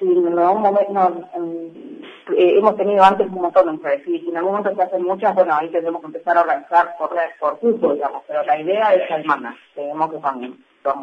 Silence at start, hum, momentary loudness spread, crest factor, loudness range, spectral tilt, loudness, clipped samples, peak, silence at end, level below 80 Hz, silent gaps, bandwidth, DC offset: 0 s; none; 13 LU; 18 dB; 3 LU; -7 dB/octave; -18 LUFS; under 0.1%; 0 dBFS; 0 s; -64 dBFS; none; 7.6 kHz; under 0.1%